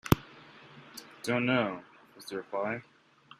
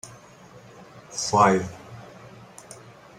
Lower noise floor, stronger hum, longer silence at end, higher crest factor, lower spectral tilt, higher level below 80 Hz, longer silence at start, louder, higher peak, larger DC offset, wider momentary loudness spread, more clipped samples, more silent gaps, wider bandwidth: first, -53 dBFS vs -48 dBFS; neither; first, 0.6 s vs 0.45 s; first, 30 dB vs 22 dB; about the same, -5.5 dB/octave vs -4.5 dB/octave; first, -52 dBFS vs -62 dBFS; about the same, 0.05 s vs 0.05 s; second, -32 LUFS vs -22 LUFS; about the same, -4 dBFS vs -4 dBFS; neither; second, 24 LU vs 27 LU; neither; neither; about the same, 15 kHz vs 15 kHz